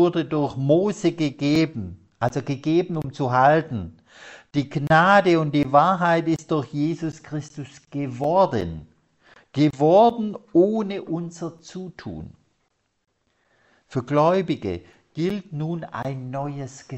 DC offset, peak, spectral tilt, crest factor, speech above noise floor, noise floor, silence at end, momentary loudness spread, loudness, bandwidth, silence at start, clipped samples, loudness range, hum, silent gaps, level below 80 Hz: under 0.1%; -4 dBFS; -7 dB/octave; 20 dB; 49 dB; -71 dBFS; 0 s; 18 LU; -22 LUFS; 8.4 kHz; 0 s; under 0.1%; 7 LU; none; none; -56 dBFS